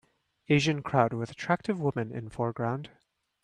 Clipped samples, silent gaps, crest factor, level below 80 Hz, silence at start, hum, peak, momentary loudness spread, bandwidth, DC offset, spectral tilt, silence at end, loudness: under 0.1%; none; 22 dB; -64 dBFS; 0.5 s; none; -8 dBFS; 10 LU; 10.5 kHz; under 0.1%; -6 dB/octave; 0.55 s; -29 LUFS